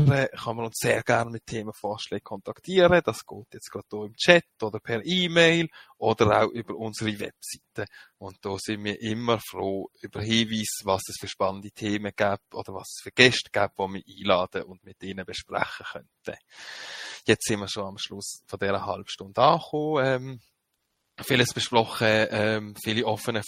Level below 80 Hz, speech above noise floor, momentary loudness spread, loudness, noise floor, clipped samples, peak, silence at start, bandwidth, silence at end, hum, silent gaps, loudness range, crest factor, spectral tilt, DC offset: -60 dBFS; 51 dB; 19 LU; -25 LUFS; -77 dBFS; under 0.1%; 0 dBFS; 0 s; 16.5 kHz; 0 s; none; none; 8 LU; 26 dB; -4.5 dB/octave; under 0.1%